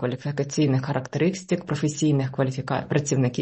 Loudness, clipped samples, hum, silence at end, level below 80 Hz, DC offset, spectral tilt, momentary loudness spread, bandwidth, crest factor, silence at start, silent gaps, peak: -25 LUFS; under 0.1%; none; 0 s; -58 dBFS; under 0.1%; -6 dB/octave; 5 LU; 8.4 kHz; 14 dB; 0 s; none; -8 dBFS